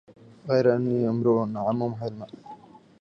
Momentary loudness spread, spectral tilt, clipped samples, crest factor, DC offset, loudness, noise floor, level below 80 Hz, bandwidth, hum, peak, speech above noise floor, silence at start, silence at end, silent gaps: 20 LU; -9 dB/octave; under 0.1%; 18 dB; under 0.1%; -25 LUFS; -47 dBFS; -66 dBFS; 6.6 kHz; none; -8 dBFS; 23 dB; 0.45 s; 0.45 s; none